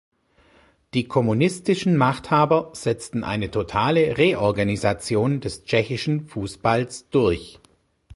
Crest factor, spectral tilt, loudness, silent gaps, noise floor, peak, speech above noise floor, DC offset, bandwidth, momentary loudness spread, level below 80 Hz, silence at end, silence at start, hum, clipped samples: 18 dB; -6 dB/octave; -22 LUFS; none; -58 dBFS; -4 dBFS; 36 dB; under 0.1%; 11.5 kHz; 8 LU; -48 dBFS; 0.65 s; 0.95 s; none; under 0.1%